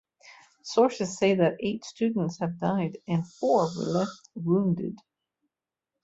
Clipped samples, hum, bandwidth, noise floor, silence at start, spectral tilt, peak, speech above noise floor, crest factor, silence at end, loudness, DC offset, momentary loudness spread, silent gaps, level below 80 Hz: under 0.1%; none; 8 kHz; -88 dBFS; 0.25 s; -6.5 dB/octave; -10 dBFS; 62 dB; 18 dB; 1.05 s; -27 LUFS; under 0.1%; 9 LU; none; -66 dBFS